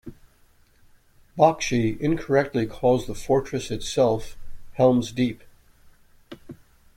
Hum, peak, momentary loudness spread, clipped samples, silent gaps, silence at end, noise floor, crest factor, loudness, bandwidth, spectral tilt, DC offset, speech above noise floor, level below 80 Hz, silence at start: none; -4 dBFS; 20 LU; under 0.1%; none; 0.4 s; -58 dBFS; 22 dB; -23 LUFS; 16 kHz; -6 dB/octave; under 0.1%; 36 dB; -46 dBFS; 0.05 s